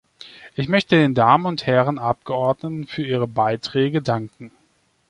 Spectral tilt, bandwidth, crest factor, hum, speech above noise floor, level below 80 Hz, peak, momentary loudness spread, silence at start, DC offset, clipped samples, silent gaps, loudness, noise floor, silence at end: -7 dB/octave; 11 kHz; 18 dB; none; 43 dB; -56 dBFS; -2 dBFS; 12 LU; 0.25 s; under 0.1%; under 0.1%; none; -20 LUFS; -63 dBFS; 0.6 s